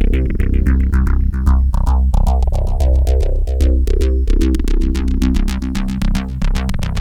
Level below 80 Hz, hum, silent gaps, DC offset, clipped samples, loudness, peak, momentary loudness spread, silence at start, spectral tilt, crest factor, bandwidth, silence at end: -14 dBFS; none; none; under 0.1%; under 0.1%; -17 LUFS; -2 dBFS; 5 LU; 0 s; -7.5 dB/octave; 12 dB; 12 kHz; 0 s